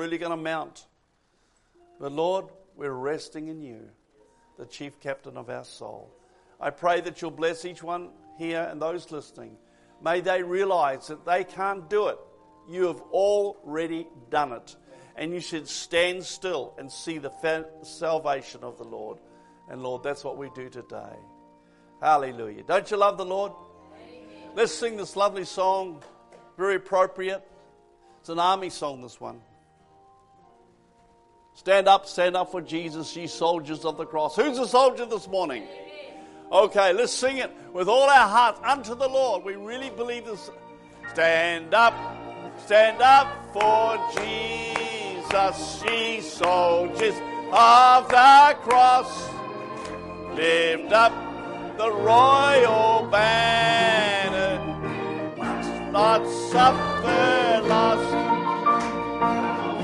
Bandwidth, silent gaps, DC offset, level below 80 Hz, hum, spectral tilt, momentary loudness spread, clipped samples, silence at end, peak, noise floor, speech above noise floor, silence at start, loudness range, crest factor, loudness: 11.5 kHz; none; under 0.1%; -58 dBFS; none; -3.5 dB/octave; 21 LU; under 0.1%; 0 s; -4 dBFS; -68 dBFS; 45 dB; 0 s; 14 LU; 18 dB; -22 LUFS